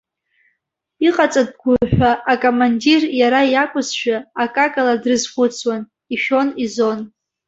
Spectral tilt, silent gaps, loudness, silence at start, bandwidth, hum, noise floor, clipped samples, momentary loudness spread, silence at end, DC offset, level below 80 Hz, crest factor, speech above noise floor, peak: -4.5 dB/octave; none; -17 LUFS; 1 s; 8 kHz; none; -73 dBFS; under 0.1%; 7 LU; 0.4 s; under 0.1%; -44 dBFS; 16 dB; 57 dB; -2 dBFS